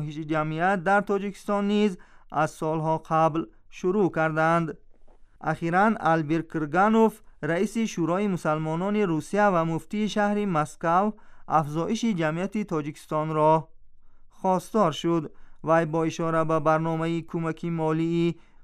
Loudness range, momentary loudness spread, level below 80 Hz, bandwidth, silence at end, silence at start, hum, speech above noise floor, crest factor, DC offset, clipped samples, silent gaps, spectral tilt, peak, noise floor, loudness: 2 LU; 8 LU; -52 dBFS; 13.5 kHz; 0 s; 0 s; none; 24 dB; 16 dB; under 0.1%; under 0.1%; none; -6.5 dB/octave; -8 dBFS; -49 dBFS; -25 LUFS